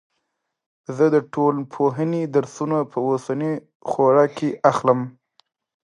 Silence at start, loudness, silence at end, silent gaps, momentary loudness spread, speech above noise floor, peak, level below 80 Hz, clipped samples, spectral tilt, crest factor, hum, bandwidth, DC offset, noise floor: 0.9 s; -21 LUFS; 0.85 s; 3.75-3.80 s; 10 LU; 56 dB; -2 dBFS; -70 dBFS; under 0.1%; -7.5 dB/octave; 20 dB; none; 10.5 kHz; under 0.1%; -76 dBFS